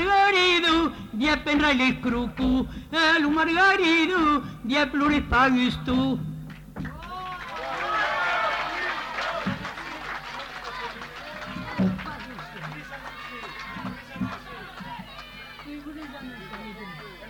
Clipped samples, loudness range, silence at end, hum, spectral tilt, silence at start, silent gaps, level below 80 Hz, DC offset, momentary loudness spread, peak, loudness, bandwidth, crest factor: under 0.1%; 15 LU; 0 s; none; -5 dB/octave; 0 s; none; -44 dBFS; under 0.1%; 19 LU; -10 dBFS; -24 LUFS; 17.5 kHz; 16 dB